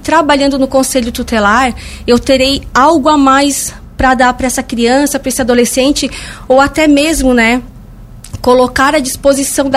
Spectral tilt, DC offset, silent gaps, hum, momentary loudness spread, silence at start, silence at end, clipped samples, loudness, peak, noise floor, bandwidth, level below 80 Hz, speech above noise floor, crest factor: -3.5 dB/octave; under 0.1%; none; none; 7 LU; 0 s; 0 s; 0.1%; -10 LUFS; 0 dBFS; -31 dBFS; 16 kHz; -30 dBFS; 22 dB; 10 dB